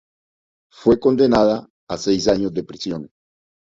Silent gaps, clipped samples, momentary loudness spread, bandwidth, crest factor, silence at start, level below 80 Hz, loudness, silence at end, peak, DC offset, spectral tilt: 1.70-1.87 s; under 0.1%; 13 LU; 7.8 kHz; 18 dB; 0.8 s; -48 dBFS; -19 LUFS; 0.75 s; -2 dBFS; under 0.1%; -5.5 dB/octave